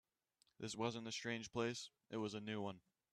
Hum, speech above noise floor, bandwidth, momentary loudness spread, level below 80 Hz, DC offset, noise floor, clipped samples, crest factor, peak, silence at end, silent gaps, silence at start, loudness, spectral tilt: none; 36 dB; 13 kHz; 7 LU; -80 dBFS; under 0.1%; -82 dBFS; under 0.1%; 22 dB; -26 dBFS; 0.35 s; none; 0.6 s; -46 LUFS; -4.5 dB/octave